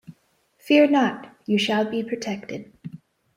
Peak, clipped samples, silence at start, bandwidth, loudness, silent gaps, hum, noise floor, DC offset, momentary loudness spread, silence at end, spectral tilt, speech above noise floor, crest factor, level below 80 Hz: -4 dBFS; under 0.1%; 0.1 s; 15 kHz; -22 LUFS; none; none; -64 dBFS; under 0.1%; 22 LU; 0.4 s; -5 dB/octave; 42 dB; 20 dB; -68 dBFS